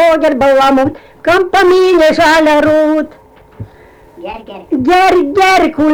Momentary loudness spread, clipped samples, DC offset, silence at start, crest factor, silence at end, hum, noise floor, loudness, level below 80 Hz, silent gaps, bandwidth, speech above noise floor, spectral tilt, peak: 18 LU; under 0.1%; under 0.1%; 0 s; 6 dB; 0 s; none; -40 dBFS; -9 LUFS; -40 dBFS; none; 20 kHz; 31 dB; -4.5 dB/octave; -4 dBFS